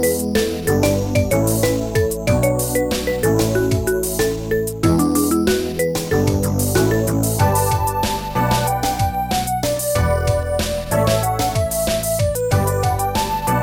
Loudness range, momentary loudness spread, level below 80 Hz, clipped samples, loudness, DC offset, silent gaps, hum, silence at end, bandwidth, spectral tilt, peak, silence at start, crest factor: 1 LU; 4 LU; -32 dBFS; under 0.1%; -18 LUFS; 0.2%; none; none; 0 s; 17 kHz; -5 dB/octave; -4 dBFS; 0 s; 14 dB